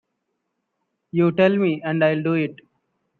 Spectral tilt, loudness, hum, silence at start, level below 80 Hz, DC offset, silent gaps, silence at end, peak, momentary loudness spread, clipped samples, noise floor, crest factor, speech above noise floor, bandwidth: -9.5 dB/octave; -20 LUFS; none; 1.15 s; -68 dBFS; under 0.1%; none; 0.65 s; -4 dBFS; 8 LU; under 0.1%; -76 dBFS; 18 dB; 57 dB; 4.5 kHz